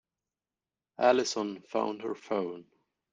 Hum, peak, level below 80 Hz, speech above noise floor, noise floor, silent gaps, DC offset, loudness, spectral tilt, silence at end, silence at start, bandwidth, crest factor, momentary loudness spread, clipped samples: none; -10 dBFS; -78 dBFS; over 60 dB; under -90 dBFS; none; under 0.1%; -31 LUFS; -3.5 dB/octave; 0.5 s; 1 s; 9.4 kHz; 22 dB; 13 LU; under 0.1%